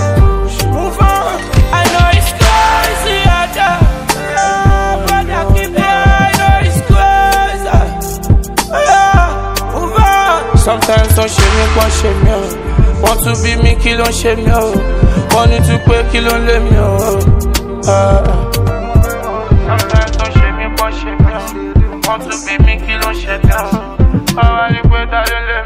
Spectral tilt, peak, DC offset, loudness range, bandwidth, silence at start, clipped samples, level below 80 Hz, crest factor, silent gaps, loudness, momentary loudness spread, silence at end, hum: -5 dB/octave; 0 dBFS; under 0.1%; 3 LU; 16.5 kHz; 0 s; 1%; -14 dBFS; 10 dB; none; -11 LUFS; 6 LU; 0 s; none